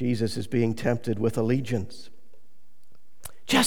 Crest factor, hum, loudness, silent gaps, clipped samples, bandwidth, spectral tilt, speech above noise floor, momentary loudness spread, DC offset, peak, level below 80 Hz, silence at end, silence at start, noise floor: 20 dB; none; -27 LUFS; none; under 0.1%; 19 kHz; -5 dB/octave; 36 dB; 19 LU; 2%; -8 dBFS; -58 dBFS; 0 s; 0 s; -63 dBFS